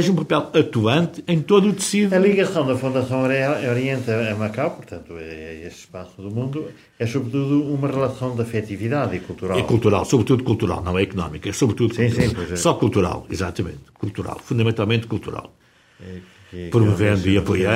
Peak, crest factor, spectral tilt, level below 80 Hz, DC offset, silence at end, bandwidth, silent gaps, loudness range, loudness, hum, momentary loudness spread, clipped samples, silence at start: -2 dBFS; 18 dB; -6 dB/octave; -46 dBFS; under 0.1%; 0 s; 16 kHz; none; 7 LU; -21 LUFS; none; 17 LU; under 0.1%; 0 s